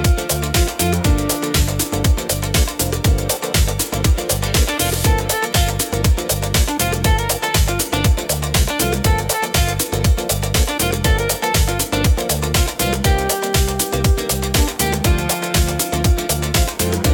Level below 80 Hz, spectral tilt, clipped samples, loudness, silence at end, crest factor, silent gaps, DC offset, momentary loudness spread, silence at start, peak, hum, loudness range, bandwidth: -22 dBFS; -4 dB/octave; under 0.1%; -17 LUFS; 0 s; 14 dB; none; under 0.1%; 2 LU; 0 s; -2 dBFS; none; 0 LU; 19 kHz